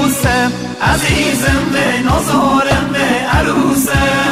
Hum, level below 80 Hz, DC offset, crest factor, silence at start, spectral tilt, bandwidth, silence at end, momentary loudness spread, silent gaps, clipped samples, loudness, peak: none; -26 dBFS; 0.5%; 12 dB; 0 s; -4.5 dB/octave; 15.5 kHz; 0 s; 2 LU; none; under 0.1%; -13 LUFS; 0 dBFS